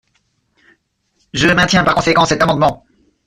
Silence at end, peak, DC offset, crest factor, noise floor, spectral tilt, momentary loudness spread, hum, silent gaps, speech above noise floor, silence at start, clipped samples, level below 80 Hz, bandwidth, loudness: 0.5 s; -2 dBFS; under 0.1%; 14 dB; -63 dBFS; -4.5 dB/octave; 8 LU; none; none; 51 dB; 1.35 s; under 0.1%; -40 dBFS; 14 kHz; -13 LUFS